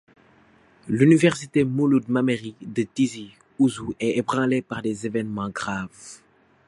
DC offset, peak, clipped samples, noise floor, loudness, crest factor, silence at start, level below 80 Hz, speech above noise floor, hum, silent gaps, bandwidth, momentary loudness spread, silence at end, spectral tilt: under 0.1%; -4 dBFS; under 0.1%; -56 dBFS; -23 LUFS; 20 dB; 0.85 s; -58 dBFS; 34 dB; none; none; 11.5 kHz; 13 LU; 0.5 s; -6.5 dB/octave